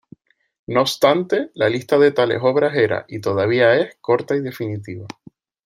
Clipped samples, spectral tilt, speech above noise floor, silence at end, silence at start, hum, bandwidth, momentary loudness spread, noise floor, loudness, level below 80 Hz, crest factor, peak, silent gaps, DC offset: under 0.1%; -5.5 dB/octave; 31 dB; 0.6 s; 0.7 s; none; 16 kHz; 12 LU; -49 dBFS; -18 LUFS; -62 dBFS; 18 dB; -2 dBFS; none; under 0.1%